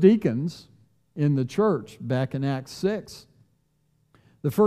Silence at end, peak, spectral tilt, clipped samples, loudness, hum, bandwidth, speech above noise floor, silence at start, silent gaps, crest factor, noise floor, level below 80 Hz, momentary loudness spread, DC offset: 0 s; -4 dBFS; -8 dB/octave; under 0.1%; -26 LUFS; none; 15 kHz; 44 dB; 0 s; none; 20 dB; -68 dBFS; -64 dBFS; 18 LU; under 0.1%